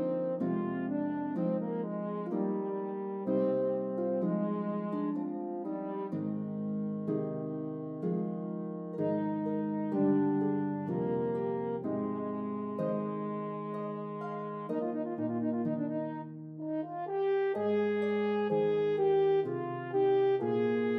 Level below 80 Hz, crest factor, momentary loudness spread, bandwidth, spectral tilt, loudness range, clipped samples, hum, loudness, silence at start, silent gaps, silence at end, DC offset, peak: -82 dBFS; 14 dB; 9 LU; 4.8 kHz; -10 dB/octave; 6 LU; under 0.1%; none; -33 LUFS; 0 s; none; 0 s; under 0.1%; -18 dBFS